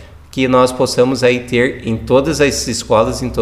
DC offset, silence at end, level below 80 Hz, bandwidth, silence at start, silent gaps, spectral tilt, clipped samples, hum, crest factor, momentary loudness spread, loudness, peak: 0.2%; 0 s; -36 dBFS; 15.5 kHz; 0 s; none; -4.5 dB/octave; under 0.1%; none; 14 dB; 6 LU; -14 LUFS; 0 dBFS